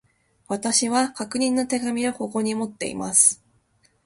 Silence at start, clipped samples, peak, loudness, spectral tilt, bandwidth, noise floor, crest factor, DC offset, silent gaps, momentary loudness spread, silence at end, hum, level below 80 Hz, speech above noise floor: 0.5 s; under 0.1%; -4 dBFS; -22 LUFS; -2 dB/octave; 12 kHz; -63 dBFS; 20 dB; under 0.1%; none; 13 LU; 0.7 s; none; -64 dBFS; 41 dB